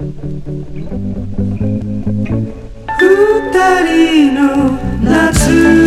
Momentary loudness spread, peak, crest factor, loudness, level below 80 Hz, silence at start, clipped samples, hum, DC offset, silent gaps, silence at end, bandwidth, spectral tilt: 15 LU; 0 dBFS; 12 dB; -12 LUFS; -26 dBFS; 0 s; under 0.1%; none; under 0.1%; none; 0 s; 15 kHz; -5.5 dB/octave